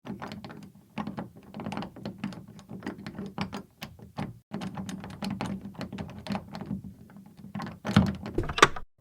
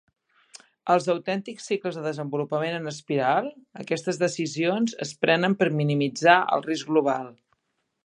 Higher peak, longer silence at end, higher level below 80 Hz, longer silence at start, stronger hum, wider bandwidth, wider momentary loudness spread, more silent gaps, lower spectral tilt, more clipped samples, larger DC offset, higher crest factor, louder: about the same, 0 dBFS vs -2 dBFS; second, 0.15 s vs 0.7 s; first, -50 dBFS vs -76 dBFS; second, 0.05 s vs 0.85 s; neither; first, 16.5 kHz vs 11 kHz; first, 19 LU vs 10 LU; first, 4.43-4.51 s vs none; about the same, -5 dB/octave vs -5 dB/octave; neither; neither; first, 32 dB vs 24 dB; second, -32 LUFS vs -25 LUFS